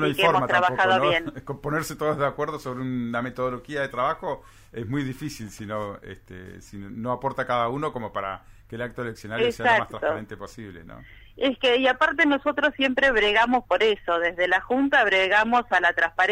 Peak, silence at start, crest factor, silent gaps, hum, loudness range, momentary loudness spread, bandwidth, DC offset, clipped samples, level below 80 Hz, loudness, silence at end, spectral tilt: -6 dBFS; 0 s; 18 dB; none; none; 10 LU; 19 LU; 16 kHz; under 0.1%; under 0.1%; -52 dBFS; -23 LUFS; 0 s; -5 dB/octave